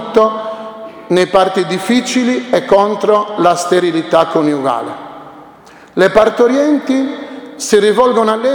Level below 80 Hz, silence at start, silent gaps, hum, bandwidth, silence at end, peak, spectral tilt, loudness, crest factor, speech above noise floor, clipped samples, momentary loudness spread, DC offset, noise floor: -48 dBFS; 0 s; none; none; 19.5 kHz; 0 s; 0 dBFS; -4.5 dB/octave; -12 LUFS; 12 dB; 27 dB; 0.1%; 15 LU; under 0.1%; -39 dBFS